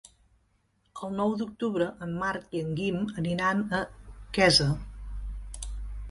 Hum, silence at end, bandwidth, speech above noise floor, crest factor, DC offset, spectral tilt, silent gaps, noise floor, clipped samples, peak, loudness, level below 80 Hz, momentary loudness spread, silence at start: none; 0 s; 11.5 kHz; 42 dB; 22 dB; under 0.1%; -4.5 dB/octave; none; -70 dBFS; under 0.1%; -8 dBFS; -28 LUFS; -42 dBFS; 19 LU; 0.95 s